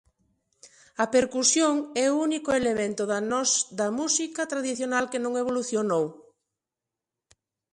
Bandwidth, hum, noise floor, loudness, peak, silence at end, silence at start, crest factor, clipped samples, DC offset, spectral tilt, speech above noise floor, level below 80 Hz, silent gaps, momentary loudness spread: 11.5 kHz; none; -88 dBFS; -25 LUFS; -8 dBFS; 1.55 s; 0.65 s; 20 dB; under 0.1%; under 0.1%; -2.5 dB/octave; 63 dB; -66 dBFS; none; 7 LU